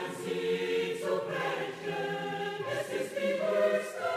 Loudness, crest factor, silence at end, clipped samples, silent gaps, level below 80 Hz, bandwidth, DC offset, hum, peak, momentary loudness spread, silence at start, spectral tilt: -32 LUFS; 16 dB; 0 s; under 0.1%; none; -76 dBFS; 15.5 kHz; under 0.1%; none; -16 dBFS; 7 LU; 0 s; -4.5 dB/octave